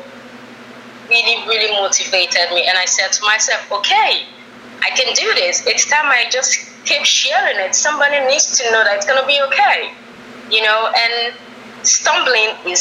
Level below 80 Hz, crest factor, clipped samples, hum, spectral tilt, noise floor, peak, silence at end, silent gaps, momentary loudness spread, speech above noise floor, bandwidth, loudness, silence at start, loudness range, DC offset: -68 dBFS; 16 dB; under 0.1%; none; 2 dB/octave; -36 dBFS; 0 dBFS; 0 s; none; 5 LU; 21 dB; 15 kHz; -13 LUFS; 0 s; 2 LU; under 0.1%